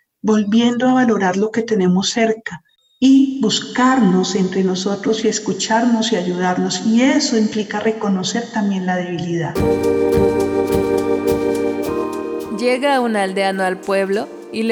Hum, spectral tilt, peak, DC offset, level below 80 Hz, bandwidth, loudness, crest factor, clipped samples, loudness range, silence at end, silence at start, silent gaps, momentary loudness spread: none; -5 dB/octave; -2 dBFS; under 0.1%; -46 dBFS; 18.5 kHz; -17 LUFS; 14 dB; under 0.1%; 2 LU; 0 s; 0.25 s; none; 7 LU